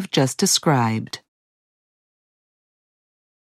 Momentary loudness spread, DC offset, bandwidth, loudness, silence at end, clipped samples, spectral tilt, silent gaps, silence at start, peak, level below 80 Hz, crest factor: 17 LU; under 0.1%; 15.5 kHz; -19 LUFS; 2.3 s; under 0.1%; -4 dB/octave; none; 0 s; -4 dBFS; -74 dBFS; 20 dB